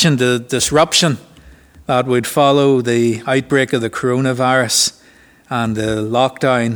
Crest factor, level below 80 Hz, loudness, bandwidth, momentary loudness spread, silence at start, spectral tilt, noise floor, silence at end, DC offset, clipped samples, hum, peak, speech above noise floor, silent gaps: 16 dB; -48 dBFS; -15 LUFS; over 20 kHz; 7 LU; 0 s; -4 dB/octave; -47 dBFS; 0 s; under 0.1%; under 0.1%; none; 0 dBFS; 33 dB; none